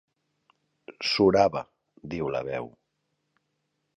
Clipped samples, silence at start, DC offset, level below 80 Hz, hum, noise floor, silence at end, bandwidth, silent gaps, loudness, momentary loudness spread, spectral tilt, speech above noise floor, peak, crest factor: under 0.1%; 0.9 s; under 0.1%; -58 dBFS; none; -78 dBFS; 1.3 s; 9.6 kHz; none; -26 LUFS; 23 LU; -5.5 dB/octave; 53 dB; -8 dBFS; 22 dB